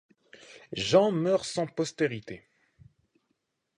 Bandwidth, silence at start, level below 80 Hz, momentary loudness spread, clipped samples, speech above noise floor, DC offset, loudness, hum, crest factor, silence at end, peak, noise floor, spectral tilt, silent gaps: 11 kHz; 0.5 s; -66 dBFS; 18 LU; under 0.1%; 51 dB; under 0.1%; -27 LUFS; none; 22 dB; 1.4 s; -8 dBFS; -79 dBFS; -5 dB/octave; none